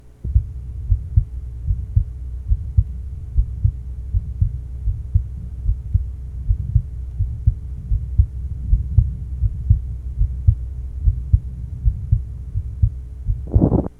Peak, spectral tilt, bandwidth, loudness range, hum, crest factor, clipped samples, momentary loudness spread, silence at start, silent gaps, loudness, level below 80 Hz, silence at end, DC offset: 0 dBFS; -12 dB/octave; 1.5 kHz; 3 LU; none; 20 dB; under 0.1%; 11 LU; 0.05 s; none; -23 LUFS; -22 dBFS; 0.1 s; under 0.1%